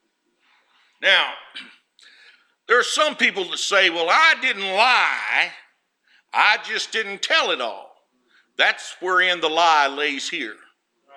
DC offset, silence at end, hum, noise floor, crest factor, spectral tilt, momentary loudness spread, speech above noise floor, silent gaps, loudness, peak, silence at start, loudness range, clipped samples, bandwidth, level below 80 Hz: under 0.1%; 0.65 s; none; -67 dBFS; 20 dB; -0.5 dB/octave; 12 LU; 47 dB; none; -19 LUFS; -2 dBFS; 1 s; 4 LU; under 0.1%; 14.5 kHz; -86 dBFS